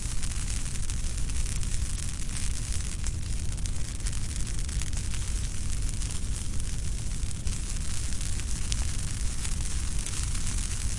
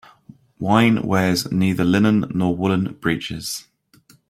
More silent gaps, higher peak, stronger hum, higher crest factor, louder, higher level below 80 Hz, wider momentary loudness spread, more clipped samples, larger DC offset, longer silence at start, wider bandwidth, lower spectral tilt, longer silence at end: neither; second, -6 dBFS vs -2 dBFS; neither; about the same, 22 dB vs 18 dB; second, -33 LUFS vs -19 LUFS; first, -32 dBFS vs -52 dBFS; second, 2 LU vs 11 LU; neither; neither; second, 0 s vs 0.6 s; second, 11.5 kHz vs 15.5 kHz; second, -3 dB/octave vs -6 dB/octave; second, 0 s vs 0.7 s